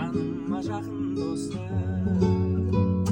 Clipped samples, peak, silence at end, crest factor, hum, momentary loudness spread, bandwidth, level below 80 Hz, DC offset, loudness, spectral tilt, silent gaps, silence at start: under 0.1%; -10 dBFS; 0 s; 16 dB; none; 7 LU; 10.5 kHz; -46 dBFS; under 0.1%; -27 LUFS; -8 dB/octave; none; 0 s